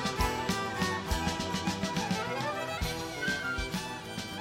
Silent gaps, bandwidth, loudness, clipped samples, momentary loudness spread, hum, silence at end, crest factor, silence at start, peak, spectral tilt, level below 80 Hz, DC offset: none; 16.5 kHz; -33 LUFS; under 0.1%; 4 LU; none; 0 s; 16 dB; 0 s; -16 dBFS; -4 dB/octave; -44 dBFS; under 0.1%